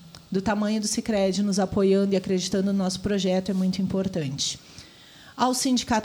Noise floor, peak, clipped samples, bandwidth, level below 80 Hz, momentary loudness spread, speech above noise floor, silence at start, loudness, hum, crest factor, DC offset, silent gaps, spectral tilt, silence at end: -49 dBFS; -10 dBFS; under 0.1%; 19 kHz; -52 dBFS; 7 LU; 25 dB; 0 s; -25 LUFS; none; 16 dB; under 0.1%; none; -5 dB/octave; 0 s